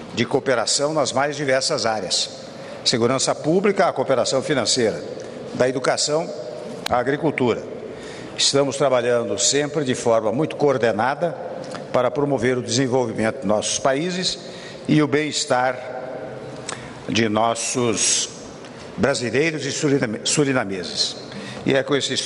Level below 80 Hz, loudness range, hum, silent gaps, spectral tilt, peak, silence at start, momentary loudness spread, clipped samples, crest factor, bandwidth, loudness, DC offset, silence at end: -56 dBFS; 2 LU; none; none; -3.5 dB/octave; -4 dBFS; 0 s; 14 LU; under 0.1%; 18 dB; 11.5 kHz; -20 LUFS; under 0.1%; 0 s